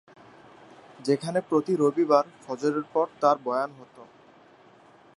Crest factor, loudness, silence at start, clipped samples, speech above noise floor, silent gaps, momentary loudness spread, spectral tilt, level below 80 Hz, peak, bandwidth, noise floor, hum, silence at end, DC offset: 22 dB; -26 LUFS; 1 s; under 0.1%; 30 dB; none; 8 LU; -6.5 dB/octave; -78 dBFS; -6 dBFS; 11.5 kHz; -55 dBFS; none; 1.15 s; under 0.1%